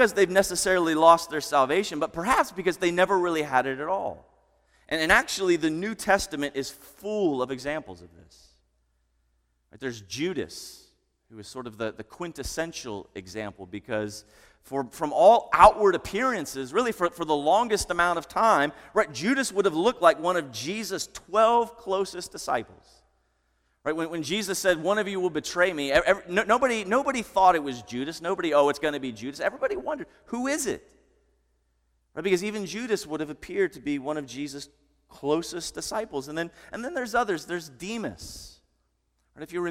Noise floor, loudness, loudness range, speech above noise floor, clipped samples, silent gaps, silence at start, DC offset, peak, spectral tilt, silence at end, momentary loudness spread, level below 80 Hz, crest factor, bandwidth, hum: -72 dBFS; -25 LUFS; 12 LU; 47 dB; under 0.1%; none; 0 s; under 0.1%; -2 dBFS; -3.5 dB/octave; 0 s; 15 LU; -54 dBFS; 26 dB; 16.5 kHz; none